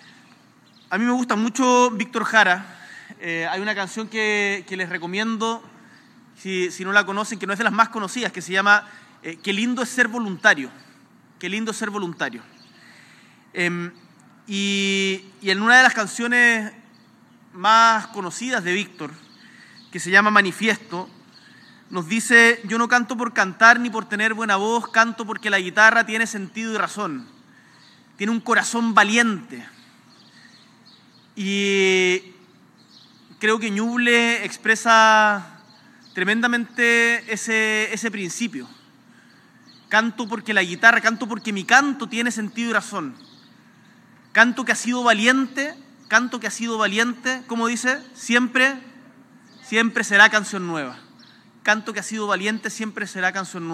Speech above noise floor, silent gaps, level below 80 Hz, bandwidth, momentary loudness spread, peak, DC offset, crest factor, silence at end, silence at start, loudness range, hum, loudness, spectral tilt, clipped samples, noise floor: 33 dB; none; -86 dBFS; 14.5 kHz; 15 LU; 0 dBFS; under 0.1%; 22 dB; 0 s; 0.9 s; 6 LU; none; -19 LUFS; -3 dB/octave; under 0.1%; -53 dBFS